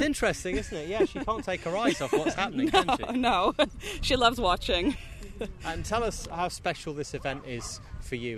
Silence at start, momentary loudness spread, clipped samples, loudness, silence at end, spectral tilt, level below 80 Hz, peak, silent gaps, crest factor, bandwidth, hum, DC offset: 0 s; 13 LU; under 0.1%; -28 LUFS; 0 s; -4 dB/octave; -42 dBFS; -6 dBFS; none; 22 dB; 13.5 kHz; none; under 0.1%